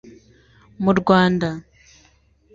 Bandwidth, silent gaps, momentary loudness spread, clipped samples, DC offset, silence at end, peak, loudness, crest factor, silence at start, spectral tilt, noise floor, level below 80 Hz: 7.6 kHz; none; 11 LU; under 0.1%; under 0.1%; 0.95 s; -2 dBFS; -18 LUFS; 20 dB; 0.8 s; -7 dB/octave; -57 dBFS; -52 dBFS